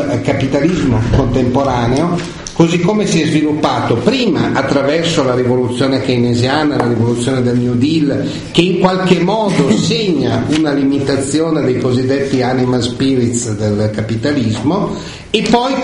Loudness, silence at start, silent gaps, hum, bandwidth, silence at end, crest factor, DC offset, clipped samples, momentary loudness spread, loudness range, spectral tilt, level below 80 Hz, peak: -14 LUFS; 0 s; none; none; 11 kHz; 0 s; 12 dB; under 0.1%; under 0.1%; 4 LU; 2 LU; -6 dB/octave; -34 dBFS; 0 dBFS